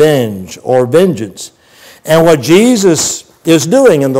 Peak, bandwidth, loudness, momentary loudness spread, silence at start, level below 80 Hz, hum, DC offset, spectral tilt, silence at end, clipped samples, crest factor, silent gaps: 0 dBFS; 16.5 kHz; -9 LUFS; 16 LU; 0 s; -48 dBFS; none; under 0.1%; -5 dB/octave; 0 s; under 0.1%; 10 dB; none